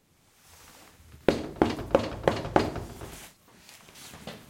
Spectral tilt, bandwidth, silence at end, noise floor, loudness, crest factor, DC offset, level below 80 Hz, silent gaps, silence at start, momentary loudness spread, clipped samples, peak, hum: -6 dB/octave; 16.5 kHz; 0.05 s; -61 dBFS; -28 LUFS; 26 dB; under 0.1%; -50 dBFS; none; 0.7 s; 24 LU; under 0.1%; -6 dBFS; none